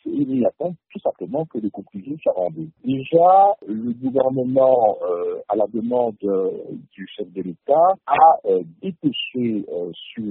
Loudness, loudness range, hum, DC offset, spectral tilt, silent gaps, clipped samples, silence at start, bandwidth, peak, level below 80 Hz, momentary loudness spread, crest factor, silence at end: -20 LUFS; 4 LU; none; under 0.1%; -5 dB/octave; none; under 0.1%; 0.05 s; 4.1 kHz; -2 dBFS; -66 dBFS; 17 LU; 18 dB; 0 s